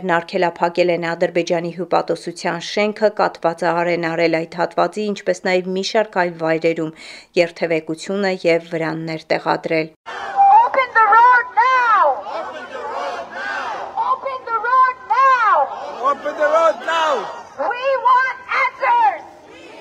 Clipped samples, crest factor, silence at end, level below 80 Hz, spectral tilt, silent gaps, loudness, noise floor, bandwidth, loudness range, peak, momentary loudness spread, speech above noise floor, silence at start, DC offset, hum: under 0.1%; 18 dB; 0 s; -66 dBFS; -5 dB/octave; 9.96-10.04 s; -17 LUFS; -40 dBFS; 11 kHz; 6 LU; 0 dBFS; 12 LU; 21 dB; 0 s; under 0.1%; none